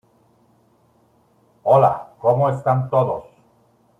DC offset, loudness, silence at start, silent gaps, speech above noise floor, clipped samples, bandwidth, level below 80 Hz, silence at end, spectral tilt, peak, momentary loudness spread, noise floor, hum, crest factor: under 0.1%; -19 LUFS; 1.65 s; none; 42 dB; under 0.1%; 7.8 kHz; -60 dBFS; 0.75 s; -9.5 dB/octave; -2 dBFS; 10 LU; -58 dBFS; none; 18 dB